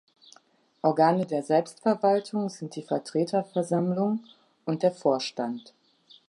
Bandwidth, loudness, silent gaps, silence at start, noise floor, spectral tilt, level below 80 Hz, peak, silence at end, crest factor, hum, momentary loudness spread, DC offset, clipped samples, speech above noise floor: 11.5 kHz; -27 LUFS; none; 0.85 s; -62 dBFS; -6.5 dB/octave; -80 dBFS; -8 dBFS; 0.7 s; 20 dB; none; 11 LU; under 0.1%; under 0.1%; 36 dB